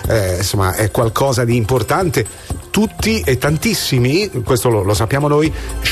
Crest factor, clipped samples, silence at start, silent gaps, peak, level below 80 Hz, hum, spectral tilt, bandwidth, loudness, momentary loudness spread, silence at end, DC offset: 10 dB; under 0.1%; 0 s; none; -6 dBFS; -32 dBFS; none; -5 dB/octave; 14 kHz; -16 LUFS; 4 LU; 0 s; under 0.1%